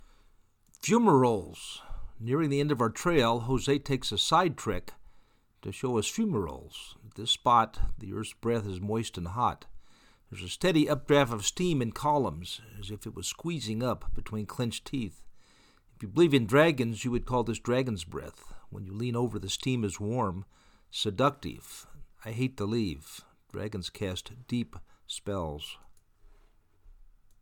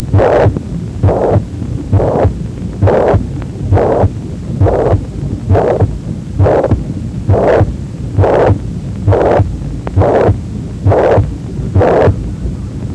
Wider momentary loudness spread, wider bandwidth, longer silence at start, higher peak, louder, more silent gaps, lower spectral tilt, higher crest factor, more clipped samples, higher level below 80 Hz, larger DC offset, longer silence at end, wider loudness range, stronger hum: first, 18 LU vs 11 LU; first, 19 kHz vs 8.8 kHz; first, 0.8 s vs 0 s; second, -8 dBFS vs 0 dBFS; second, -30 LUFS vs -13 LUFS; neither; second, -5 dB/octave vs -9 dB/octave; first, 22 dB vs 12 dB; neither; second, -46 dBFS vs -24 dBFS; neither; first, 0.35 s vs 0 s; first, 8 LU vs 2 LU; neither